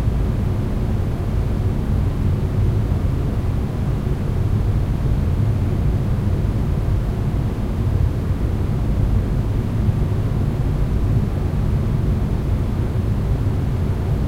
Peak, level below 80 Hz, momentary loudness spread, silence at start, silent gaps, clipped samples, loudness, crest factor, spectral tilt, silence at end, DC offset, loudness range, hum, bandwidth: -6 dBFS; -24 dBFS; 2 LU; 0 s; none; under 0.1%; -21 LUFS; 14 dB; -9 dB/octave; 0 s; under 0.1%; 1 LU; none; 15 kHz